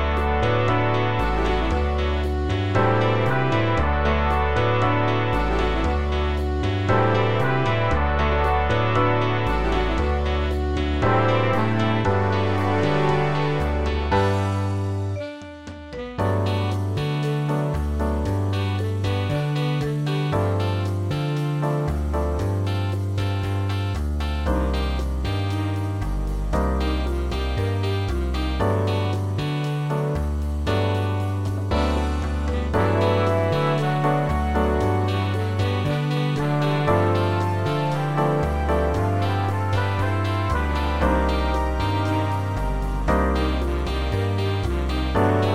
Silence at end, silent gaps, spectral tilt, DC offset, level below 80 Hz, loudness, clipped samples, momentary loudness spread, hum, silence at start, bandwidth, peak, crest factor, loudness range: 0 s; none; -7 dB/octave; under 0.1%; -28 dBFS; -23 LUFS; under 0.1%; 5 LU; none; 0 s; 13 kHz; -6 dBFS; 14 dB; 4 LU